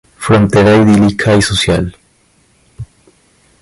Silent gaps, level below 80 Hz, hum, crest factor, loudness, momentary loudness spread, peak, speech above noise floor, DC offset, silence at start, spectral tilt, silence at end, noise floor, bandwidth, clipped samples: none; -34 dBFS; none; 12 dB; -10 LUFS; 24 LU; 0 dBFS; 43 dB; under 0.1%; 0.2 s; -5.5 dB/octave; 0.8 s; -52 dBFS; 11.5 kHz; under 0.1%